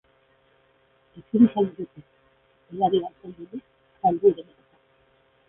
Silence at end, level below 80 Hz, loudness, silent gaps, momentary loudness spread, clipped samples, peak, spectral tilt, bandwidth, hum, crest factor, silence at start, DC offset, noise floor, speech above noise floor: 1.05 s; -64 dBFS; -23 LUFS; none; 21 LU; under 0.1%; -6 dBFS; -11.5 dB/octave; 3.7 kHz; none; 20 dB; 1.15 s; under 0.1%; -63 dBFS; 40 dB